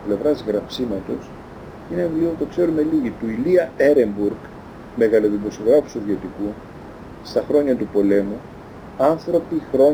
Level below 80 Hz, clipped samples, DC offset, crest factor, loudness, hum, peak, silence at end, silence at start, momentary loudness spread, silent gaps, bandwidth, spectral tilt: -48 dBFS; under 0.1%; under 0.1%; 16 dB; -20 LUFS; none; -4 dBFS; 0 s; 0 s; 21 LU; none; over 20 kHz; -7.5 dB/octave